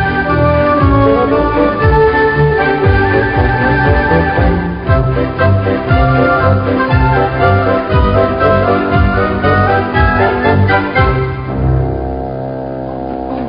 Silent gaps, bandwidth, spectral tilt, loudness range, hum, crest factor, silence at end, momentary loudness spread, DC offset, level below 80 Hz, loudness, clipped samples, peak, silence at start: none; 5.2 kHz; -11 dB/octave; 2 LU; none; 10 dB; 0 s; 7 LU; 0.4%; -22 dBFS; -12 LUFS; under 0.1%; 0 dBFS; 0 s